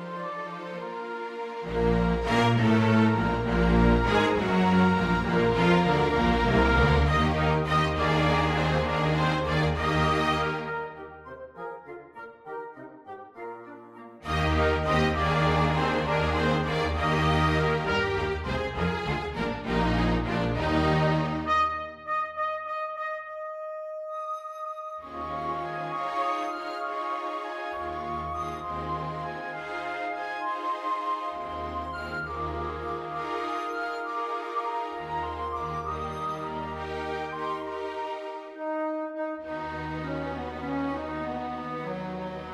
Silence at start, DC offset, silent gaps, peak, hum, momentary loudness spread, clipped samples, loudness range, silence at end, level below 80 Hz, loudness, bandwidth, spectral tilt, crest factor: 0 s; under 0.1%; none; -8 dBFS; none; 14 LU; under 0.1%; 10 LU; 0 s; -38 dBFS; -27 LUFS; 12 kHz; -6.5 dB/octave; 18 dB